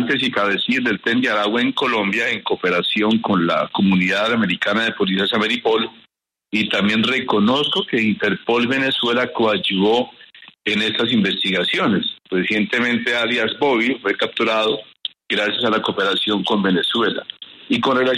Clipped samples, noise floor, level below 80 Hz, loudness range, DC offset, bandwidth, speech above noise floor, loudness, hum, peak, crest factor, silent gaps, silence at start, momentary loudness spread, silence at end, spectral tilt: under 0.1%; -60 dBFS; -62 dBFS; 1 LU; under 0.1%; 12 kHz; 42 dB; -18 LUFS; none; -4 dBFS; 16 dB; none; 0 s; 5 LU; 0 s; -5.5 dB/octave